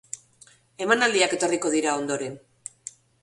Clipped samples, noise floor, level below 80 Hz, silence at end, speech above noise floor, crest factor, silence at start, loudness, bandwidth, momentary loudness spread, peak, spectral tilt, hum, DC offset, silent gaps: under 0.1%; -56 dBFS; -70 dBFS; 0.85 s; 32 dB; 20 dB; 0.15 s; -23 LUFS; 11.5 kHz; 21 LU; -6 dBFS; -2.5 dB/octave; none; under 0.1%; none